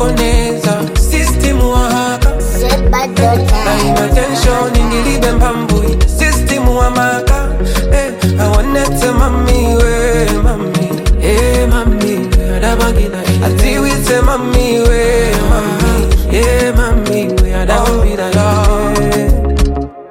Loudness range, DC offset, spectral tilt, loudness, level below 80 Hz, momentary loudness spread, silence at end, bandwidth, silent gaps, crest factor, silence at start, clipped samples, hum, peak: 1 LU; under 0.1%; -5.5 dB/octave; -12 LUFS; -14 dBFS; 3 LU; 0 s; 16.5 kHz; none; 10 dB; 0 s; under 0.1%; none; 0 dBFS